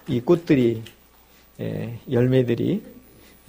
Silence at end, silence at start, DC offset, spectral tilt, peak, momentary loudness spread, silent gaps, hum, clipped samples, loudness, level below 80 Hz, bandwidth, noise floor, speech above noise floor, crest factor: 0.5 s; 0.05 s; under 0.1%; -8.5 dB/octave; -6 dBFS; 13 LU; none; none; under 0.1%; -22 LUFS; -54 dBFS; 15.5 kHz; -53 dBFS; 32 dB; 18 dB